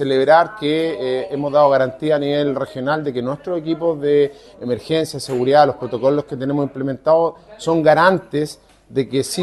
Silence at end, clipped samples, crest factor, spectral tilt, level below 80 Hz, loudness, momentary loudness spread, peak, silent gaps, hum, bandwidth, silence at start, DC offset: 0 s; under 0.1%; 18 dB; -5.5 dB/octave; -56 dBFS; -18 LUFS; 10 LU; 0 dBFS; none; none; 12.5 kHz; 0 s; under 0.1%